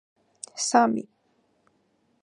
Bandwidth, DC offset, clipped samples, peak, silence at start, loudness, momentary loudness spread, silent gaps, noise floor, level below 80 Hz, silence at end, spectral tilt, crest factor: 11 kHz; under 0.1%; under 0.1%; -4 dBFS; 0.55 s; -24 LUFS; 22 LU; none; -69 dBFS; -80 dBFS; 1.2 s; -3 dB/octave; 24 dB